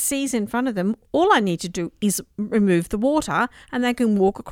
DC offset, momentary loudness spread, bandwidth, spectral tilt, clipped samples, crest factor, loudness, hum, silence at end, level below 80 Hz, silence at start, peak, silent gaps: under 0.1%; 7 LU; 17 kHz; -4.5 dB/octave; under 0.1%; 18 dB; -21 LUFS; none; 0 s; -48 dBFS; 0 s; -4 dBFS; none